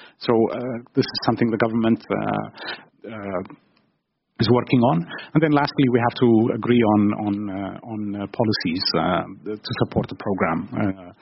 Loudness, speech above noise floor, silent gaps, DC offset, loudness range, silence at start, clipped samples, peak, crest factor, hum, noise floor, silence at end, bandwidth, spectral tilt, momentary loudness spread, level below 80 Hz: -22 LUFS; 50 dB; none; under 0.1%; 5 LU; 0 s; under 0.1%; -4 dBFS; 18 dB; none; -71 dBFS; 0.1 s; 6 kHz; -5.5 dB/octave; 13 LU; -54 dBFS